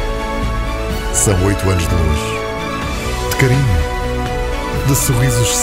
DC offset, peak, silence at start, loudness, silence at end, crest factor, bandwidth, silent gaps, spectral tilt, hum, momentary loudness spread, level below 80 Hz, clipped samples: under 0.1%; 0 dBFS; 0 s; -16 LUFS; 0 s; 14 dB; 16.5 kHz; none; -4.5 dB/octave; none; 7 LU; -22 dBFS; under 0.1%